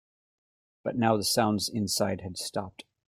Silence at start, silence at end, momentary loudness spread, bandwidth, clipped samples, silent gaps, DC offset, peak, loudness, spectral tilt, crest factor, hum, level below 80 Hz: 0.85 s; 0.4 s; 12 LU; 16.5 kHz; under 0.1%; none; under 0.1%; -10 dBFS; -28 LUFS; -4 dB/octave; 20 dB; none; -64 dBFS